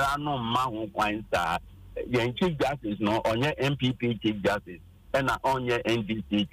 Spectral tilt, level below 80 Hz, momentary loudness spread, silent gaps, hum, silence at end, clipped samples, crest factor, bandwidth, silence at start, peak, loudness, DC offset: -6 dB/octave; -50 dBFS; 5 LU; none; none; 0.05 s; under 0.1%; 14 dB; 15.5 kHz; 0 s; -14 dBFS; -28 LUFS; under 0.1%